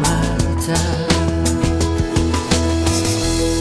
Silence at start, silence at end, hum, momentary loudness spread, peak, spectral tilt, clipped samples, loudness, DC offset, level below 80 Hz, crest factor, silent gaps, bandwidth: 0 s; 0 s; none; 2 LU; 0 dBFS; -5 dB/octave; under 0.1%; -18 LUFS; 0.3%; -24 dBFS; 16 dB; none; 11 kHz